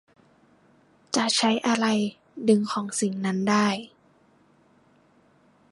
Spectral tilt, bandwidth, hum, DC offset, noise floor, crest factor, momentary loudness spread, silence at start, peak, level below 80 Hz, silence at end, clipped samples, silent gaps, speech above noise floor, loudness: -4 dB/octave; 11.5 kHz; none; under 0.1%; -60 dBFS; 20 dB; 7 LU; 1.1 s; -8 dBFS; -74 dBFS; 1.85 s; under 0.1%; none; 37 dB; -24 LUFS